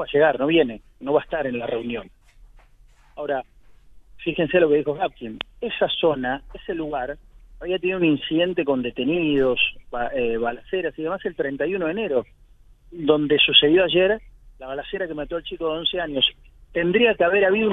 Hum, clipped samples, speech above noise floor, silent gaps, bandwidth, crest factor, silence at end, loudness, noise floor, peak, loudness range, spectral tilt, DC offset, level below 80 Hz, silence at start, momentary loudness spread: none; under 0.1%; 31 dB; none; 4 kHz; 22 dB; 0 s; -22 LUFS; -52 dBFS; 0 dBFS; 6 LU; -7.5 dB/octave; under 0.1%; -48 dBFS; 0 s; 13 LU